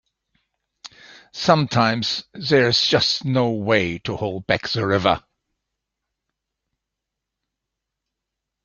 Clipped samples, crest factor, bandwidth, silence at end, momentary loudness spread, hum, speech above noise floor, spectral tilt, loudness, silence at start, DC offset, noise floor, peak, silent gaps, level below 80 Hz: under 0.1%; 22 dB; 7.4 kHz; 3.45 s; 10 LU; none; 63 dB; -5 dB/octave; -20 LUFS; 0.85 s; under 0.1%; -83 dBFS; -2 dBFS; none; -56 dBFS